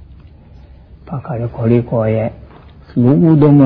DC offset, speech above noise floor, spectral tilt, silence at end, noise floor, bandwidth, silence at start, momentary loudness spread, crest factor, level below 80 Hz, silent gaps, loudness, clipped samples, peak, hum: under 0.1%; 28 dB; -13.5 dB/octave; 0 s; -39 dBFS; 4.7 kHz; 1.05 s; 14 LU; 14 dB; -40 dBFS; none; -14 LUFS; under 0.1%; 0 dBFS; none